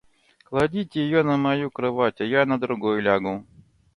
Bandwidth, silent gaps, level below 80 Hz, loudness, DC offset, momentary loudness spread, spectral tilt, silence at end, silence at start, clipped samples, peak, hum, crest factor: 11 kHz; none; -56 dBFS; -23 LUFS; under 0.1%; 5 LU; -7.5 dB/octave; 0.55 s; 0.5 s; under 0.1%; -6 dBFS; none; 18 dB